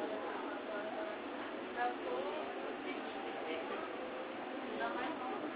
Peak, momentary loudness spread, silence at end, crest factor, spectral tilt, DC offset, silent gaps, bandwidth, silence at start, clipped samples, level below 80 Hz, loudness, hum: -26 dBFS; 4 LU; 0 s; 16 dB; -1.5 dB/octave; under 0.1%; none; 4 kHz; 0 s; under 0.1%; -78 dBFS; -42 LUFS; none